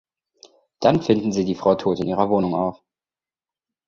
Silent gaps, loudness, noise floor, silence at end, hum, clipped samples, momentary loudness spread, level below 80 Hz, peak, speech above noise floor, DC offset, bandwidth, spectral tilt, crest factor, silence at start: none; -21 LUFS; under -90 dBFS; 1.15 s; none; under 0.1%; 4 LU; -54 dBFS; -2 dBFS; over 70 dB; under 0.1%; 7.4 kHz; -7 dB/octave; 20 dB; 0.8 s